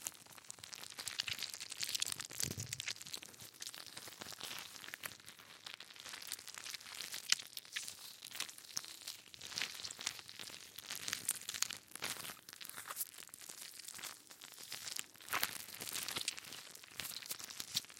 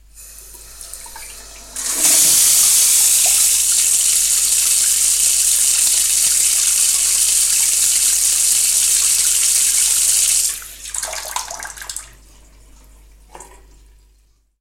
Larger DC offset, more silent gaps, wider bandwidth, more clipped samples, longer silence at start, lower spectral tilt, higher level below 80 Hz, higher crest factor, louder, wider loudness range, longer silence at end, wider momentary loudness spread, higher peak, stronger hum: neither; neither; about the same, 17 kHz vs 16.5 kHz; neither; second, 0 s vs 0.15 s; first, 0 dB/octave vs 3 dB/octave; second, -82 dBFS vs -46 dBFS; first, 38 dB vs 16 dB; second, -44 LUFS vs -11 LUFS; second, 5 LU vs 10 LU; second, 0 s vs 1.15 s; second, 11 LU vs 19 LU; second, -10 dBFS vs 0 dBFS; neither